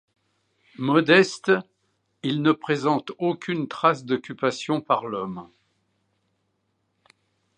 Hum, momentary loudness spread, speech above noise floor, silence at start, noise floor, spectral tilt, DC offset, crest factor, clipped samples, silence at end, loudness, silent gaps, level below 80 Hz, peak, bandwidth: none; 13 LU; 50 dB; 0.8 s; -73 dBFS; -5.5 dB/octave; under 0.1%; 24 dB; under 0.1%; 2.1 s; -23 LUFS; none; -72 dBFS; -2 dBFS; 9.6 kHz